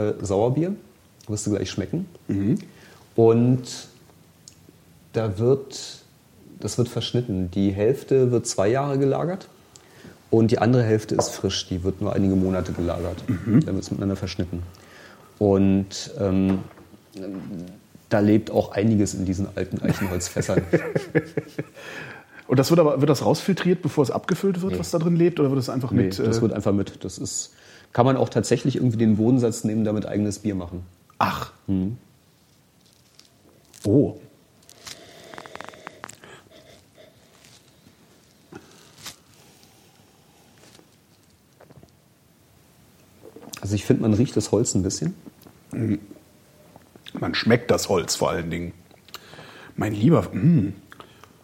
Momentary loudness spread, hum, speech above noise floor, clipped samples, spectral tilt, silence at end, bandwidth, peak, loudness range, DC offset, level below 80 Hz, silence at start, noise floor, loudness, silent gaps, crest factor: 19 LU; none; 36 dB; under 0.1%; -6 dB/octave; 0.65 s; 16.5 kHz; -2 dBFS; 7 LU; under 0.1%; -54 dBFS; 0 s; -58 dBFS; -23 LUFS; none; 22 dB